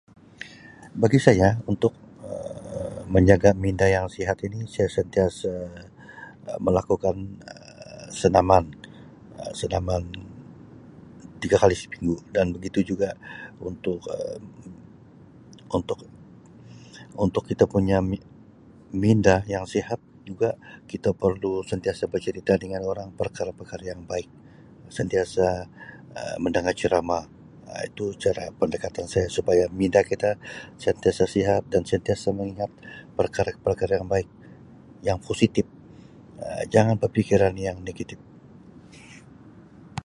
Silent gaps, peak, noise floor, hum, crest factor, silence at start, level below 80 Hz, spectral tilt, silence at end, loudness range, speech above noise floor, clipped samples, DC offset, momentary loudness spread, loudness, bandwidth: none; 0 dBFS; -50 dBFS; none; 24 dB; 0.4 s; -44 dBFS; -6.5 dB/octave; 0.05 s; 7 LU; 26 dB; under 0.1%; under 0.1%; 21 LU; -24 LUFS; 11.5 kHz